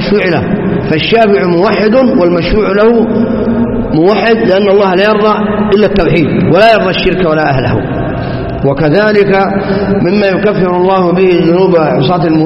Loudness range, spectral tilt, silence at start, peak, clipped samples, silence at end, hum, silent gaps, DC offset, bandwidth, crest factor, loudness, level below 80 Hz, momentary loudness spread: 2 LU; -8.5 dB/octave; 0 s; 0 dBFS; 0.3%; 0 s; none; none; under 0.1%; 6 kHz; 8 dB; -9 LUFS; -28 dBFS; 5 LU